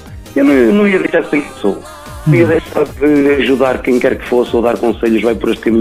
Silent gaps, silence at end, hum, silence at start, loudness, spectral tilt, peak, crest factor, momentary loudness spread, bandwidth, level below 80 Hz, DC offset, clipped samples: none; 0 s; none; 0 s; -12 LUFS; -7 dB/octave; 0 dBFS; 12 dB; 9 LU; 15.5 kHz; -36 dBFS; under 0.1%; under 0.1%